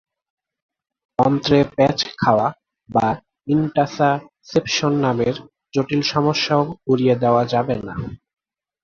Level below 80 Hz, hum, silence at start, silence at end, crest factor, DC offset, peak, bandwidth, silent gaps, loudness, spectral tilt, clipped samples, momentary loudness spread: -50 dBFS; none; 1.2 s; 0.7 s; 18 dB; under 0.1%; -2 dBFS; 7.2 kHz; none; -19 LUFS; -6 dB/octave; under 0.1%; 9 LU